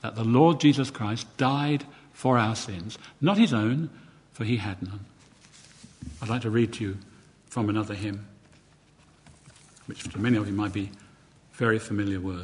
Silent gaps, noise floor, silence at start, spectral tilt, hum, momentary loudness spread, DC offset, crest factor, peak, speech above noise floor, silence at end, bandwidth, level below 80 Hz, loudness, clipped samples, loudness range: none; -58 dBFS; 0.05 s; -6.5 dB/octave; none; 17 LU; under 0.1%; 22 dB; -6 dBFS; 32 dB; 0 s; 11 kHz; -54 dBFS; -26 LUFS; under 0.1%; 8 LU